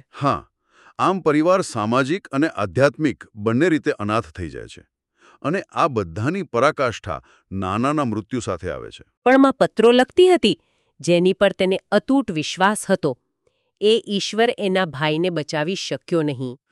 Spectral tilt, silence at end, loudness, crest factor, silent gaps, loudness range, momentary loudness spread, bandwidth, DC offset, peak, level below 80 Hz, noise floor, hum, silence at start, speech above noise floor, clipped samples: -5.5 dB/octave; 0.15 s; -20 LUFS; 16 dB; 9.17-9.22 s; 6 LU; 14 LU; 12.5 kHz; under 0.1%; -4 dBFS; -54 dBFS; -68 dBFS; none; 0.15 s; 48 dB; under 0.1%